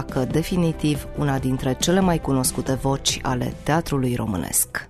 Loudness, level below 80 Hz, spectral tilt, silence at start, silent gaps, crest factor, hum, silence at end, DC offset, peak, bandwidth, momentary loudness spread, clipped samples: -22 LUFS; -38 dBFS; -4.5 dB/octave; 0 s; none; 16 dB; none; 0 s; under 0.1%; -6 dBFS; 14 kHz; 5 LU; under 0.1%